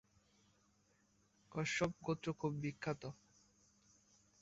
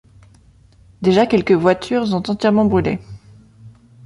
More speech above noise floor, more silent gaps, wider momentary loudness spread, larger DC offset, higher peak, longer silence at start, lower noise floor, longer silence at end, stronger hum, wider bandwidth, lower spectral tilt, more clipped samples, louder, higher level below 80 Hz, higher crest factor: about the same, 34 dB vs 34 dB; neither; first, 11 LU vs 7 LU; neither; second, -24 dBFS vs -2 dBFS; first, 1.5 s vs 1 s; first, -76 dBFS vs -49 dBFS; first, 1.3 s vs 0.35 s; neither; second, 8 kHz vs 11.5 kHz; second, -5 dB/octave vs -7 dB/octave; neither; second, -42 LUFS vs -17 LUFS; second, -72 dBFS vs -46 dBFS; about the same, 22 dB vs 18 dB